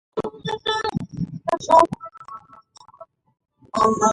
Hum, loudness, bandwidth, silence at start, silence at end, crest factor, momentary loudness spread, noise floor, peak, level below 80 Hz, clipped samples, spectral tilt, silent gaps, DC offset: none; -21 LUFS; 11.5 kHz; 0.15 s; 0 s; 20 dB; 22 LU; -48 dBFS; -2 dBFS; -54 dBFS; under 0.1%; -4.5 dB/octave; none; under 0.1%